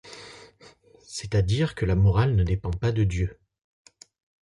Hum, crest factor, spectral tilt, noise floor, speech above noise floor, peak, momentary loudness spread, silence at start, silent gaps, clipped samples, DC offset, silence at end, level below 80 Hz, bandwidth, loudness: none; 14 dB; -7 dB/octave; -54 dBFS; 31 dB; -12 dBFS; 18 LU; 0.05 s; none; under 0.1%; under 0.1%; 1.15 s; -36 dBFS; 11 kHz; -25 LUFS